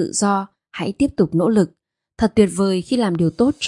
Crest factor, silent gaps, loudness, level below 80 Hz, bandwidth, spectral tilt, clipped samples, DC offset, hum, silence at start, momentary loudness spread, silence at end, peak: 18 dB; none; -19 LUFS; -48 dBFS; 11.5 kHz; -5.5 dB/octave; under 0.1%; under 0.1%; none; 0 s; 8 LU; 0 s; -2 dBFS